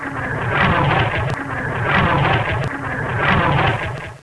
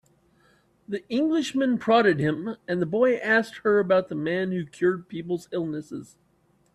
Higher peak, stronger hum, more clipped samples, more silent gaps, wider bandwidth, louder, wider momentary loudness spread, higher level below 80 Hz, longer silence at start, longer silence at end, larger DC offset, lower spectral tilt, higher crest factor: first, -2 dBFS vs -8 dBFS; neither; neither; neither; second, 11 kHz vs 12.5 kHz; first, -18 LUFS vs -25 LUFS; second, 8 LU vs 12 LU; first, -34 dBFS vs -66 dBFS; second, 0 s vs 0.9 s; second, 0.05 s vs 0.7 s; neither; about the same, -6.5 dB/octave vs -6.5 dB/octave; about the same, 16 dB vs 18 dB